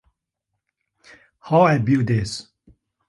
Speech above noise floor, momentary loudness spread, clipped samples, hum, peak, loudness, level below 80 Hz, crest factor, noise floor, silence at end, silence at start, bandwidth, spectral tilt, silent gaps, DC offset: 62 dB; 13 LU; under 0.1%; none; -4 dBFS; -19 LUFS; -50 dBFS; 20 dB; -80 dBFS; 0.65 s; 1.45 s; 11.5 kHz; -7 dB/octave; none; under 0.1%